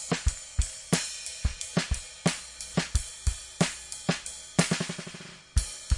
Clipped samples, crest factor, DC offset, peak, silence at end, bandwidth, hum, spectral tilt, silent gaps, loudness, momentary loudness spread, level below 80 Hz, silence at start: under 0.1%; 22 dB; under 0.1%; -8 dBFS; 0 s; 11.5 kHz; none; -4 dB/octave; none; -31 LUFS; 5 LU; -36 dBFS; 0 s